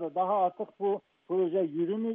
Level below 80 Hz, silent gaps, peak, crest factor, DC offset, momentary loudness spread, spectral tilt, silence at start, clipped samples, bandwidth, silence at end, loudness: -88 dBFS; none; -18 dBFS; 12 dB; under 0.1%; 6 LU; -7 dB/octave; 0 s; under 0.1%; 3.7 kHz; 0 s; -30 LUFS